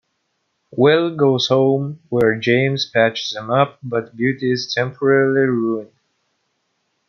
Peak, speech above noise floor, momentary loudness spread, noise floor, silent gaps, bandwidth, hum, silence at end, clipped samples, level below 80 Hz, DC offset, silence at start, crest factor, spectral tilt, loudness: -2 dBFS; 53 dB; 8 LU; -70 dBFS; none; 6.8 kHz; none; 1.25 s; under 0.1%; -60 dBFS; under 0.1%; 0.75 s; 16 dB; -6 dB/octave; -18 LUFS